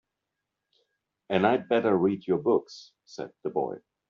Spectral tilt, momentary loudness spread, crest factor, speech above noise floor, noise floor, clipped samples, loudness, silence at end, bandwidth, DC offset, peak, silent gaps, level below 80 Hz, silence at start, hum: -5 dB/octave; 18 LU; 20 dB; 58 dB; -85 dBFS; under 0.1%; -27 LUFS; 0.3 s; 7.2 kHz; under 0.1%; -10 dBFS; none; -70 dBFS; 1.3 s; none